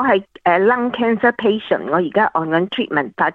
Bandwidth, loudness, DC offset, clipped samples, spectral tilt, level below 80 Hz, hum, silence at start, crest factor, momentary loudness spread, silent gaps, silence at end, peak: 4.7 kHz; -17 LUFS; under 0.1%; under 0.1%; -8 dB/octave; -58 dBFS; none; 0 s; 16 dB; 4 LU; none; 0 s; -2 dBFS